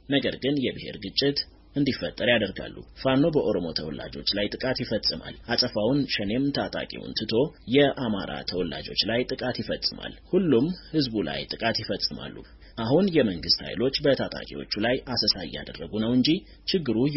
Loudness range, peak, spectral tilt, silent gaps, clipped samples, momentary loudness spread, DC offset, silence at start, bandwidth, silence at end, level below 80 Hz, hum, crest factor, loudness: 1 LU; -6 dBFS; -3.5 dB/octave; none; under 0.1%; 10 LU; under 0.1%; 0.1 s; 6 kHz; 0 s; -50 dBFS; none; 20 dB; -26 LUFS